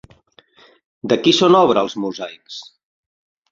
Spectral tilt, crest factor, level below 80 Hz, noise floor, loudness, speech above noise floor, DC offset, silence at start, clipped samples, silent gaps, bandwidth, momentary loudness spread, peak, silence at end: -5 dB/octave; 20 dB; -60 dBFS; -52 dBFS; -15 LUFS; 36 dB; under 0.1%; 1.05 s; under 0.1%; none; 7.8 kHz; 22 LU; 0 dBFS; 0.9 s